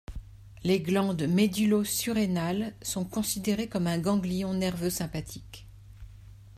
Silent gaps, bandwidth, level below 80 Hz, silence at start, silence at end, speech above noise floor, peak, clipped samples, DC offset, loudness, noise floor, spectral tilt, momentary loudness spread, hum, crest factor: none; 15.5 kHz; -50 dBFS; 0.1 s; 0.05 s; 21 dB; -12 dBFS; under 0.1%; under 0.1%; -28 LUFS; -49 dBFS; -5 dB/octave; 15 LU; none; 16 dB